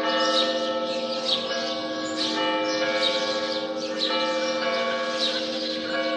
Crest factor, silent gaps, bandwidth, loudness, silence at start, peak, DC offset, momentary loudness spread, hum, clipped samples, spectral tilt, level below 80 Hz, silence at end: 16 dB; none; 10.5 kHz; -25 LUFS; 0 s; -10 dBFS; under 0.1%; 5 LU; none; under 0.1%; -2 dB/octave; -76 dBFS; 0 s